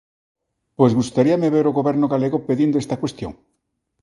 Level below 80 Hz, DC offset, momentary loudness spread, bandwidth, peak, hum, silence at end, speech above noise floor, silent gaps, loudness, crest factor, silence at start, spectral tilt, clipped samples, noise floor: -54 dBFS; under 0.1%; 9 LU; 11.5 kHz; 0 dBFS; none; 0.7 s; 55 dB; none; -19 LUFS; 20 dB; 0.8 s; -7.5 dB/octave; under 0.1%; -73 dBFS